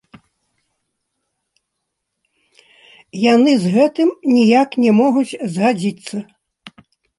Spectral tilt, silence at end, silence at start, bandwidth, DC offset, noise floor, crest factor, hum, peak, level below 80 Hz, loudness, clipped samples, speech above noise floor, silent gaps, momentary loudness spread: -6 dB/octave; 0.5 s; 3.15 s; 11.5 kHz; under 0.1%; -76 dBFS; 16 dB; none; -2 dBFS; -66 dBFS; -15 LUFS; under 0.1%; 62 dB; none; 14 LU